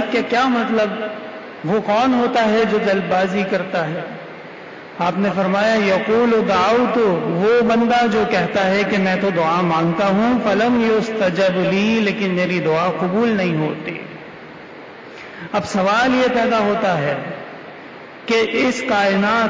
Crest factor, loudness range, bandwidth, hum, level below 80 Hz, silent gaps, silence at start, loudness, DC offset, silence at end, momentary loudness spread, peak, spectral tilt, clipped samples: 10 dB; 4 LU; 7.8 kHz; none; -54 dBFS; none; 0 s; -17 LUFS; under 0.1%; 0 s; 18 LU; -8 dBFS; -6 dB/octave; under 0.1%